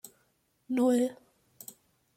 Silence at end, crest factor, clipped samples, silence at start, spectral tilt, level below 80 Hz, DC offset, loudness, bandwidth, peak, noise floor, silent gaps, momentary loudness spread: 1.05 s; 16 dB; under 0.1%; 0.7 s; -4.5 dB/octave; -78 dBFS; under 0.1%; -29 LUFS; 16 kHz; -16 dBFS; -73 dBFS; none; 22 LU